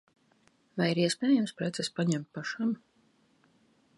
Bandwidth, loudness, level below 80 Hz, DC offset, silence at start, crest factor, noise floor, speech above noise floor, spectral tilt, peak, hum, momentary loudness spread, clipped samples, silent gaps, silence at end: 11.5 kHz; -30 LUFS; -78 dBFS; under 0.1%; 0.75 s; 18 dB; -68 dBFS; 38 dB; -5 dB/octave; -14 dBFS; none; 10 LU; under 0.1%; none; 1.2 s